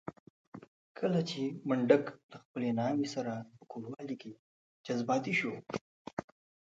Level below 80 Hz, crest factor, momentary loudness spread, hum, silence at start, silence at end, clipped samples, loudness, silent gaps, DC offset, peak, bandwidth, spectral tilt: -76 dBFS; 24 dB; 23 LU; none; 0.05 s; 0.45 s; under 0.1%; -35 LUFS; 0.20-0.52 s, 0.68-0.95 s, 2.23-2.29 s, 2.45-2.54 s, 4.39-4.84 s, 5.81-6.05 s, 6.13-6.17 s; under 0.1%; -10 dBFS; 7.8 kHz; -6 dB/octave